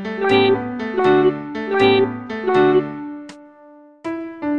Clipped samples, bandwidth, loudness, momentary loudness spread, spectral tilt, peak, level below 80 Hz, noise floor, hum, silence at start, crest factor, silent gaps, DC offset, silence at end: under 0.1%; 7.2 kHz; -18 LUFS; 15 LU; -7 dB/octave; -2 dBFS; -54 dBFS; -45 dBFS; none; 0 s; 16 dB; none; under 0.1%; 0 s